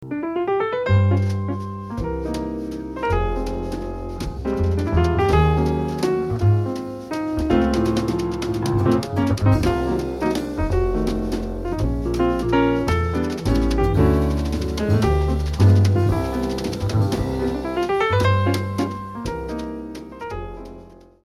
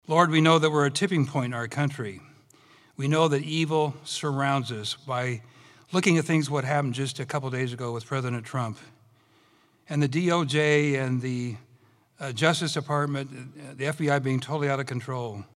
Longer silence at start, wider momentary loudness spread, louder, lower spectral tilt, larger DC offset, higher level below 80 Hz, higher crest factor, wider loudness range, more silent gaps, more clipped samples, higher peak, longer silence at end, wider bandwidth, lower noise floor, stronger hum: about the same, 0 s vs 0.1 s; about the same, 11 LU vs 12 LU; first, -21 LUFS vs -26 LUFS; first, -7.5 dB/octave vs -5.5 dB/octave; neither; first, -30 dBFS vs -72 dBFS; second, 16 dB vs 22 dB; about the same, 4 LU vs 3 LU; neither; neither; about the same, -4 dBFS vs -6 dBFS; first, 0.3 s vs 0.1 s; about the same, 13 kHz vs 13 kHz; second, -43 dBFS vs -62 dBFS; neither